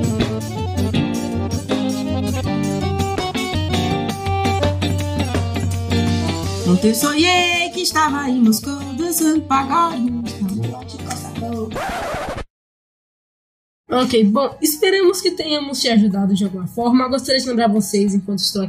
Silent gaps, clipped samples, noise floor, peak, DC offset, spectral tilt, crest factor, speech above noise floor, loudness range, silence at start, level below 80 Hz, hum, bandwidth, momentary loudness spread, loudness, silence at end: 12.50-13.84 s; under 0.1%; under -90 dBFS; -4 dBFS; under 0.1%; -5 dB/octave; 16 dB; over 74 dB; 6 LU; 0 s; -42 dBFS; none; 16 kHz; 9 LU; -18 LUFS; 0 s